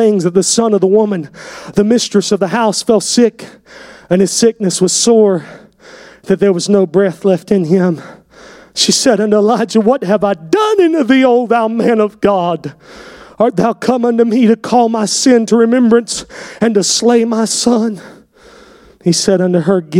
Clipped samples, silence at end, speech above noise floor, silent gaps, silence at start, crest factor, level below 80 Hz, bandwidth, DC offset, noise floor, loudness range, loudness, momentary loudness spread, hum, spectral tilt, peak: under 0.1%; 0 s; 30 dB; none; 0 s; 12 dB; -52 dBFS; 16 kHz; under 0.1%; -41 dBFS; 3 LU; -12 LUFS; 8 LU; none; -4.5 dB/octave; 0 dBFS